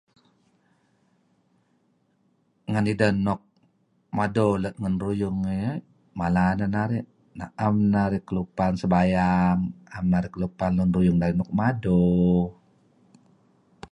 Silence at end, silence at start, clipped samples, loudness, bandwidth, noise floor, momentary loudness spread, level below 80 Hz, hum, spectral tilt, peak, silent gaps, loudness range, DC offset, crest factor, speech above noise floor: 1.4 s; 2.7 s; under 0.1%; -24 LUFS; 10.5 kHz; -67 dBFS; 11 LU; -46 dBFS; none; -8.5 dB/octave; -8 dBFS; none; 6 LU; under 0.1%; 18 dB; 44 dB